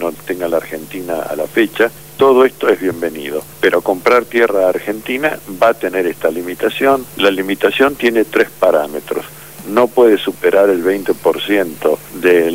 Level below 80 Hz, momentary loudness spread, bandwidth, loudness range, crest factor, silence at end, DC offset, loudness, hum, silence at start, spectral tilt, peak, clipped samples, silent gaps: -54 dBFS; 10 LU; 16.5 kHz; 2 LU; 14 dB; 0 s; 0.6%; -14 LUFS; none; 0 s; -4.5 dB/octave; 0 dBFS; under 0.1%; none